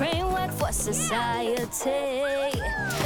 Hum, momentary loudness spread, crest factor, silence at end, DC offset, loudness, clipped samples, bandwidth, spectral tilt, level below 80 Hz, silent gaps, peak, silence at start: none; 2 LU; 14 dB; 0 s; under 0.1%; -27 LUFS; under 0.1%; 19.5 kHz; -3.5 dB/octave; -40 dBFS; none; -14 dBFS; 0 s